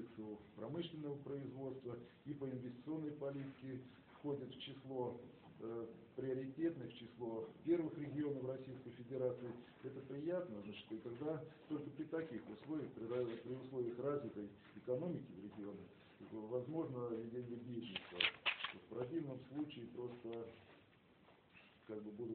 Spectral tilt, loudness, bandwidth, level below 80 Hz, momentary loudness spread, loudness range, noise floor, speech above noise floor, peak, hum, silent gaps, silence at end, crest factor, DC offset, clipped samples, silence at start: -4.5 dB/octave; -47 LUFS; 4.5 kHz; -80 dBFS; 11 LU; 5 LU; -69 dBFS; 23 dB; -18 dBFS; none; none; 0 s; 28 dB; under 0.1%; under 0.1%; 0 s